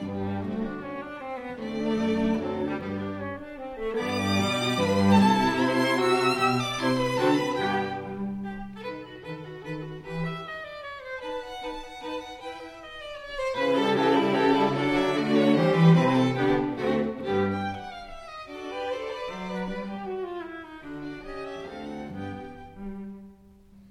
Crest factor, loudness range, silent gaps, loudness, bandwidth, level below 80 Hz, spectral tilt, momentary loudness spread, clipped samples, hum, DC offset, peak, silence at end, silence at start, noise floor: 20 dB; 13 LU; none; -26 LUFS; 14.5 kHz; -52 dBFS; -6 dB/octave; 17 LU; under 0.1%; none; under 0.1%; -8 dBFS; 0.1 s; 0 s; -53 dBFS